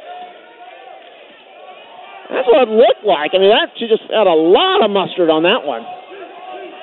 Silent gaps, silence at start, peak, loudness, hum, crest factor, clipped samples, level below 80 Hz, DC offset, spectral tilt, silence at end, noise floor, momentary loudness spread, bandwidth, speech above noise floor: none; 0 s; 0 dBFS; -13 LUFS; none; 14 dB; under 0.1%; -60 dBFS; under 0.1%; -9 dB/octave; 0 s; -40 dBFS; 22 LU; 4.3 kHz; 28 dB